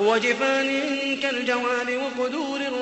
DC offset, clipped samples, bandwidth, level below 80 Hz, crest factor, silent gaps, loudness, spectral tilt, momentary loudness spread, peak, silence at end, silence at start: under 0.1%; under 0.1%; 8.4 kHz; -68 dBFS; 16 dB; none; -24 LUFS; -3 dB/octave; 6 LU; -8 dBFS; 0 s; 0 s